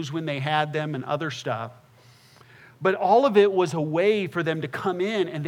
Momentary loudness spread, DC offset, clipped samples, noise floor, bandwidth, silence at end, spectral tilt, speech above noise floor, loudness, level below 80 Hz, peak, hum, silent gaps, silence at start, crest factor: 10 LU; under 0.1%; under 0.1%; -54 dBFS; 12.5 kHz; 0 s; -6 dB/octave; 30 dB; -24 LUFS; -78 dBFS; -6 dBFS; none; none; 0 s; 20 dB